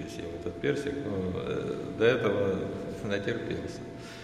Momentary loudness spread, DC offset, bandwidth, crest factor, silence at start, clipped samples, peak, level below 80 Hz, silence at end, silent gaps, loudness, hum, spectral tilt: 12 LU; under 0.1%; 12.5 kHz; 20 dB; 0 s; under 0.1%; -12 dBFS; -56 dBFS; 0 s; none; -31 LUFS; none; -6.5 dB/octave